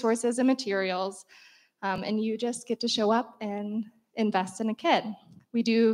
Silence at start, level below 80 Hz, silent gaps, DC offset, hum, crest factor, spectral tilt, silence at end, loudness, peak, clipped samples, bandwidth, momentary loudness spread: 0 s; -74 dBFS; none; under 0.1%; none; 20 dB; -4.5 dB/octave; 0 s; -28 LUFS; -8 dBFS; under 0.1%; 12 kHz; 11 LU